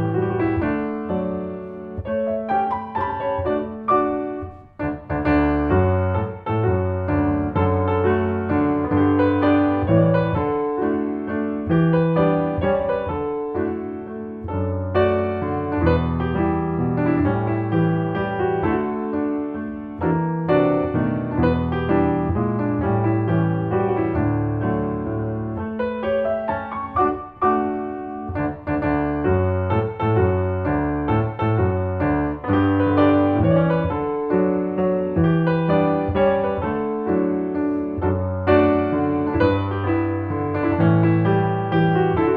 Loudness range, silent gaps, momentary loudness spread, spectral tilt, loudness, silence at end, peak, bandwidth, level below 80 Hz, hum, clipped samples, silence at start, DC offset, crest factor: 4 LU; none; 8 LU; -11 dB/octave; -21 LUFS; 0 s; -2 dBFS; 4.8 kHz; -40 dBFS; none; under 0.1%; 0 s; under 0.1%; 18 dB